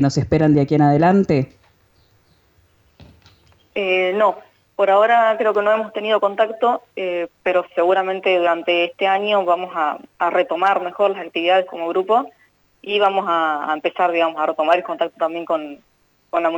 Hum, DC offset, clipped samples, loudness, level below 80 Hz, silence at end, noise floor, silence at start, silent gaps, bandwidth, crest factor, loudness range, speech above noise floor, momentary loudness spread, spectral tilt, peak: none; under 0.1%; under 0.1%; -18 LUFS; -54 dBFS; 0 s; -57 dBFS; 0 s; none; 19 kHz; 14 dB; 3 LU; 40 dB; 9 LU; -6.5 dB/octave; -4 dBFS